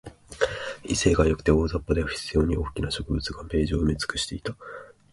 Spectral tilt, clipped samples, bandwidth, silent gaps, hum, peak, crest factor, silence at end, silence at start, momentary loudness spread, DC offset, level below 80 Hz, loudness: -5 dB/octave; under 0.1%; 11.5 kHz; none; none; -6 dBFS; 20 dB; 0.25 s; 0.05 s; 13 LU; under 0.1%; -34 dBFS; -26 LUFS